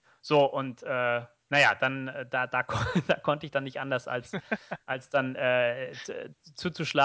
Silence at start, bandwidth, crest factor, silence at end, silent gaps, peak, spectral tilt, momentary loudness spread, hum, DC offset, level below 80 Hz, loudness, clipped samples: 0.25 s; 8 kHz; 20 dB; 0 s; none; -10 dBFS; -5 dB/octave; 12 LU; none; under 0.1%; -58 dBFS; -29 LUFS; under 0.1%